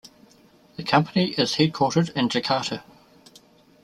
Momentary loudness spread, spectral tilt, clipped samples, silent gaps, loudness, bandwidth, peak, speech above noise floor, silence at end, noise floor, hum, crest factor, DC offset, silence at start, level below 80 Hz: 12 LU; -5 dB/octave; under 0.1%; none; -23 LUFS; 13 kHz; -2 dBFS; 33 dB; 1.05 s; -55 dBFS; none; 22 dB; under 0.1%; 0.8 s; -62 dBFS